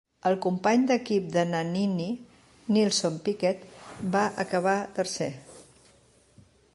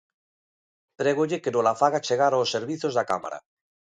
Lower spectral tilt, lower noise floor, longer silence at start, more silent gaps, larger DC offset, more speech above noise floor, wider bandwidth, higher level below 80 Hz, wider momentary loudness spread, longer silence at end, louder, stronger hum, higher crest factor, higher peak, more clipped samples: about the same, -5 dB/octave vs -4.5 dB/octave; second, -60 dBFS vs under -90 dBFS; second, 0.25 s vs 1 s; neither; neither; second, 34 dB vs over 66 dB; first, 11.5 kHz vs 10 kHz; first, -66 dBFS vs -72 dBFS; first, 12 LU vs 7 LU; first, 1.15 s vs 0.6 s; second, -27 LUFS vs -24 LUFS; neither; about the same, 18 dB vs 20 dB; second, -10 dBFS vs -6 dBFS; neither